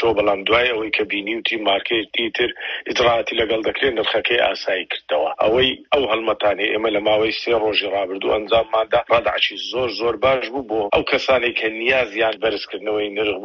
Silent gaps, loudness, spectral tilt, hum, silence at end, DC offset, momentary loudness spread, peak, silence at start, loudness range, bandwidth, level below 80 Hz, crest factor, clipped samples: none; -19 LUFS; -4 dB/octave; none; 0 s; under 0.1%; 6 LU; -4 dBFS; 0 s; 1 LU; 7 kHz; -50 dBFS; 16 dB; under 0.1%